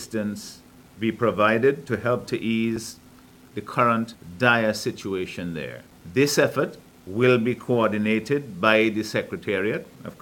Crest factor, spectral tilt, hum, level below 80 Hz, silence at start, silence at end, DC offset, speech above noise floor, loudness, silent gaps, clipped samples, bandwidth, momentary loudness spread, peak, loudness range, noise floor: 22 dB; -5 dB/octave; none; -60 dBFS; 0 s; 0.1 s; under 0.1%; 26 dB; -23 LUFS; none; under 0.1%; 18 kHz; 14 LU; -2 dBFS; 3 LU; -50 dBFS